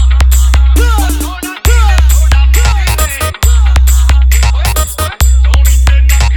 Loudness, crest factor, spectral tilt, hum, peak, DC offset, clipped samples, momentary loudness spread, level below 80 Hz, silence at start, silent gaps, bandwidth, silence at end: -9 LUFS; 6 dB; -4 dB/octave; none; 0 dBFS; under 0.1%; 0.1%; 5 LU; -8 dBFS; 0 s; none; 18.5 kHz; 0 s